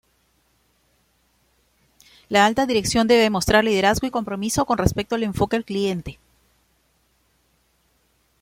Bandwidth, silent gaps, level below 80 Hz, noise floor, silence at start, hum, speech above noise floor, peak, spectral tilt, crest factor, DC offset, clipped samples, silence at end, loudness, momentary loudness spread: 16.5 kHz; none; -42 dBFS; -65 dBFS; 2.3 s; none; 45 dB; -2 dBFS; -4.5 dB/octave; 20 dB; under 0.1%; under 0.1%; 2.3 s; -20 LUFS; 9 LU